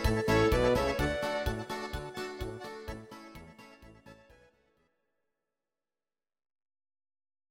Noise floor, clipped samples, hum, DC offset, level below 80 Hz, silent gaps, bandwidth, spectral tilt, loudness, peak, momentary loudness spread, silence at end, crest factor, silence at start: under -90 dBFS; under 0.1%; none; under 0.1%; -44 dBFS; none; 16.5 kHz; -5.5 dB/octave; -31 LUFS; -14 dBFS; 23 LU; 3.35 s; 20 dB; 0 s